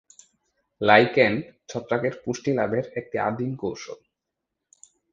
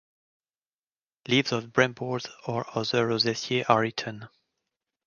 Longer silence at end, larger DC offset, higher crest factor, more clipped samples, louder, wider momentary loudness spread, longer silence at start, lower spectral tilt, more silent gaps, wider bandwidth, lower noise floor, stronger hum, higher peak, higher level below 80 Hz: first, 1.2 s vs 0.8 s; neither; about the same, 24 dB vs 24 dB; neither; first, -23 LUFS vs -26 LUFS; first, 18 LU vs 10 LU; second, 0.8 s vs 1.3 s; about the same, -5.5 dB/octave vs -4.5 dB/octave; neither; about the same, 7.8 kHz vs 7.2 kHz; second, -83 dBFS vs under -90 dBFS; neither; first, 0 dBFS vs -4 dBFS; first, -62 dBFS vs -68 dBFS